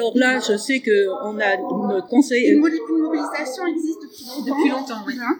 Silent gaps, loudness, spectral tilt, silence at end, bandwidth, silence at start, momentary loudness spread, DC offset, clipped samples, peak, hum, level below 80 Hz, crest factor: none; -20 LUFS; -4 dB/octave; 0 s; 19 kHz; 0 s; 10 LU; under 0.1%; under 0.1%; -2 dBFS; none; -80 dBFS; 18 dB